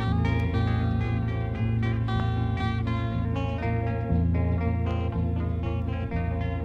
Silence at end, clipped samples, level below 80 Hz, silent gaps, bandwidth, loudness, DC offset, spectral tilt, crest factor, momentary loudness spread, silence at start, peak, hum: 0 s; under 0.1%; -34 dBFS; none; 5.6 kHz; -27 LUFS; under 0.1%; -9 dB/octave; 14 dB; 4 LU; 0 s; -12 dBFS; none